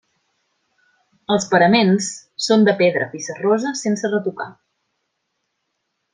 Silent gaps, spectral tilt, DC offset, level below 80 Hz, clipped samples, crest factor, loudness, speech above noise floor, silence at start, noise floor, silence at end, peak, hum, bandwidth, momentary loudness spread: none; -4.5 dB/octave; under 0.1%; -66 dBFS; under 0.1%; 18 dB; -18 LUFS; 57 dB; 1.3 s; -74 dBFS; 1.6 s; -2 dBFS; none; 9.8 kHz; 13 LU